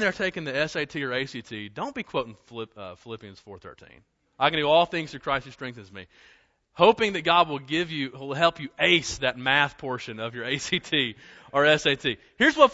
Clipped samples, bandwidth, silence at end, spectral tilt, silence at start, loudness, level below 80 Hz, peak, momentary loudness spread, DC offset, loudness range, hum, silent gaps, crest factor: under 0.1%; 8 kHz; 0 s; -4 dB/octave; 0 s; -24 LUFS; -58 dBFS; -2 dBFS; 19 LU; under 0.1%; 8 LU; none; none; 24 dB